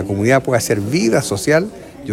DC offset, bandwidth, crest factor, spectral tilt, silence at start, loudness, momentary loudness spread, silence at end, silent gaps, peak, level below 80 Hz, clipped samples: under 0.1%; 16.5 kHz; 16 dB; -5 dB/octave; 0 s; -16 LUFS; 6 LU; 0 s; none; 0 dBFS; -48 dBFS; under 0.1%